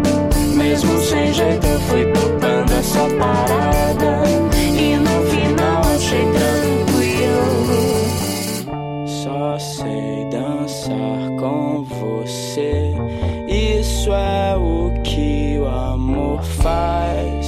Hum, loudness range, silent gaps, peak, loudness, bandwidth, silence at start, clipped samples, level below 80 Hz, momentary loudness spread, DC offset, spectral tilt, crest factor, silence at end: none; 6 LU; none; -4 dBFS; -18 LUFS; 16.5 kHz; 0 s; under 0.1%; -26 dBFS; 8 LU; under 0.1%; -5.5 dB/octave; 12 dB; 0 s